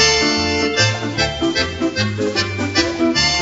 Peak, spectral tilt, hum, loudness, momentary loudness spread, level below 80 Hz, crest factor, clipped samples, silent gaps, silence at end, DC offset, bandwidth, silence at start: -2 dBFS; -3 dB/octave; none; -17 LUFS; 5 LU; -38 dBFS; 16 dB; under 0.1%; none; 0 s; under 0.1%; 8 kHz; 0 s